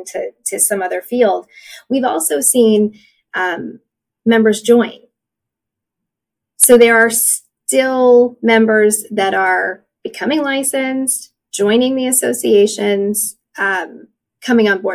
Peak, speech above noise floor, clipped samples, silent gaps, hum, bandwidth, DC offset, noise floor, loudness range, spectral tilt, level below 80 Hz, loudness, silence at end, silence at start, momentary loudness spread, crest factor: 0 dBFS; 68 dB; under 0.1%; none; none; 16 kHz; under 0.1%; -82 dBFS; 5 LU; -2.5 dB/octave; -62 dBFS; -14 LUFS; 0 s; 0 s; 12 LU; 14 dB